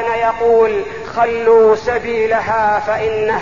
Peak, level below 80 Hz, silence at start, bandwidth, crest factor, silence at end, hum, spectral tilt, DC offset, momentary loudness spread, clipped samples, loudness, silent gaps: -2 dBFS; -44 dBFS; 0 s; 7.2 kHz; 12 dB; 0 s; none; -5.5 dB/octave; 0.8%; 7 LU; under 0.1%; -14 LUFS; none